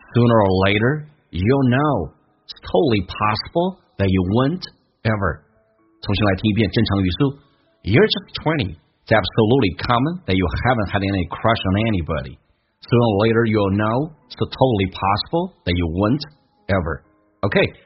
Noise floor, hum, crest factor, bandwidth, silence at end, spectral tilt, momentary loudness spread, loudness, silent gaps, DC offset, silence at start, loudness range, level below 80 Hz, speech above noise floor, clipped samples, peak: -59 dBFS; none; 20 dB; 5.8 kHz; 0.15 s; -5.5 dB/octave; 11 LU; -19 LUFS; none; under 0.1%; 0.1 s; 3 LU; -40 dBFS; 40 dB; under 0.1%; 0 dBFS